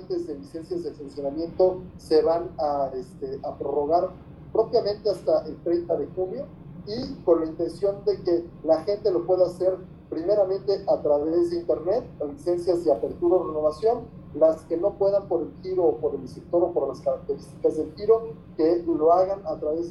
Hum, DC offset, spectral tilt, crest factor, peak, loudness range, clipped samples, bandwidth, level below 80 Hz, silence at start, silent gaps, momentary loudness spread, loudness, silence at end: none; under 0.1%; -7.5 dB/octave; 18 dB; -8 dBFS; 2 LU; under 0.1%; 11.5 kHz; -52 dBFS; 0 s; none; 11 LU; -25 LUFS; 0 s